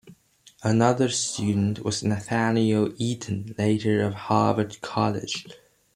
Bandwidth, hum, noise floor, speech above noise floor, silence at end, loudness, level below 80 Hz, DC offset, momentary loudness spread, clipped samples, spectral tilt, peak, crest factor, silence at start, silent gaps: 12 kHz; none; -56 dBFS; 32 dB; 0.4 s; -25 LUFS; -60 dBFS; under 0.1%; 9 LU; under 0.1%; -5.5 dB/octave; -6 dBFS; 18 dB; 0.05 s; none